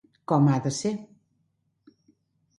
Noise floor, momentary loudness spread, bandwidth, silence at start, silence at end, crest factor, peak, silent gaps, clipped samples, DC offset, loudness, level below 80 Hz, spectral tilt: -73 dBFS; 10 LU; 11.5 kHz; 0.3 s; 1.55 s; 20 dB; -8 dBFS; none; under 0.1%; under 0.1%; -25 LUFS; -68 dBFS; -6.5 dB/octave